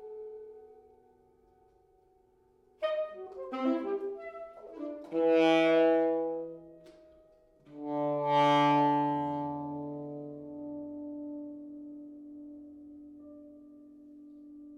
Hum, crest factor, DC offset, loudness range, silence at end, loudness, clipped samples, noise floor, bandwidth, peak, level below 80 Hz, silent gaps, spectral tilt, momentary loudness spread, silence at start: none; 20 dB; under 0.1%; 15 LU; 0 s; -30 LUFS; under 0.1%; -66 dBFS; 10.5 kHz; -14 dBFS; -74 dBFS; none; -6.5 dB/octave; 26 LU; 0 s